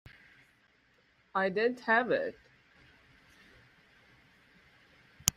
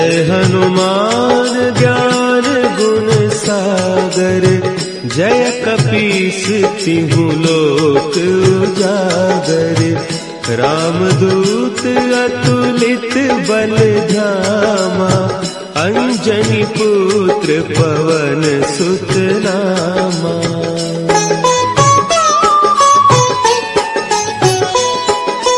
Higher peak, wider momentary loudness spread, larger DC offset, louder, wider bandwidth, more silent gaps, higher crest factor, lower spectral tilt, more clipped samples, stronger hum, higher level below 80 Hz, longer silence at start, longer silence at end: about the same, 0 dBFS vs 0 dBFS; first, 12 LU vs 5 LU; second, under 0.1% vs 0.1%; second, -31 LUFS vs -12 LUFS; first, 15.5 kHz vs 11.5 kHz; neither; first, 36 dB vs 12 dB; second, -2.5 dB/octave vs -5 dB/octave; neither; neither; second, -64 dBFS vs -46 dBFS; first, 1.35 s vs 0 s; about the same, 0.05 s vs 0 s